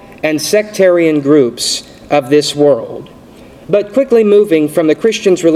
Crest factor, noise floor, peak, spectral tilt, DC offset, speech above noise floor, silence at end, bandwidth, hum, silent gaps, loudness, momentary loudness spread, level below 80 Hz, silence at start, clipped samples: 12 dB; -36 dBFS; 0 dBFS; -4.5 dB/octave; under 0.1%; 26 dB; 0 s; 15.5 kHz; none; none; -11 LUFS; 7 LU; -50 dBFS; 0.05 s; under 0.1%